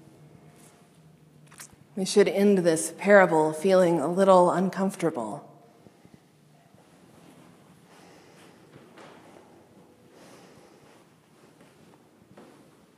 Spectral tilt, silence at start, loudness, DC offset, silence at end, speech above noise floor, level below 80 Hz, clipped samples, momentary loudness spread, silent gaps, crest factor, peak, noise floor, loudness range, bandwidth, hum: -5.5 dB/octave; 1.6 s; -22 LUFS; under 0.1%; 7.55 s; 37 dB; -78 dBFS; under 0.1%; 22 LU; none; 24 dB; -2 dBFS; -58 dBFS; 14 LU; 15 kHz; none